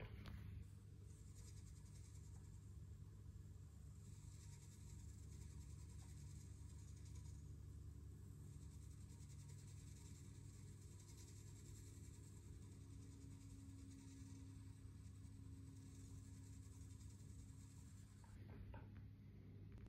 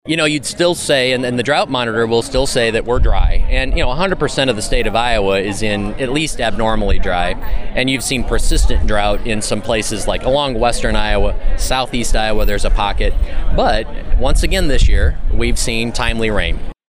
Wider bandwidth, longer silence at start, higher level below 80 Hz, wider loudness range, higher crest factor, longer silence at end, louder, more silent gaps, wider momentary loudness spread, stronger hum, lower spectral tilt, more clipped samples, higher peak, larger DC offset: about the same, 15.5 kHz vs 15.5 kHz; about the same, 0 s vs 0.05 s; second, -64 dBFS vs -18 dBFS; about the same, 2 LU vs 2 LU; about the same, 14 dB vs 10 dB; second, 0 s vs 0.15 s; second, -60 LUFS vs -17 LUFS; neither; about the same, 3 LU vs 4 LU; neither; first, -5.5 dB/octave vs -4 dB/octave; neither; second, -44 dBFS vs -2 dBFS; neither